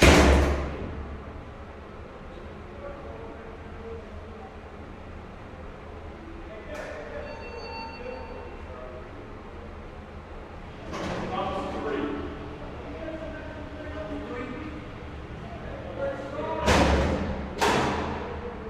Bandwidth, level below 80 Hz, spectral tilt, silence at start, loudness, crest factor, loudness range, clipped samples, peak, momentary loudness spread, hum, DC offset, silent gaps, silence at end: 14.5 kHz; -36 dBFS; -5 dB/octave; 0 s; -30 LUFS; 26 dB; 14 LU; under 0.1%; -4 dBFS; 19 LU; none; under 0.1%; none; 0 s